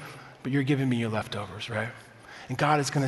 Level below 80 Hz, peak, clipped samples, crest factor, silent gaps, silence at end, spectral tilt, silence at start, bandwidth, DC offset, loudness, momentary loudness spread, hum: -64 dBFS; -10 dBFS; under 0.1%; 20 dB; none; 0 s; -5.5 dB/octave; 0 s; 12 kHz; under 0.1%; -29 LUFS; 20 LU; none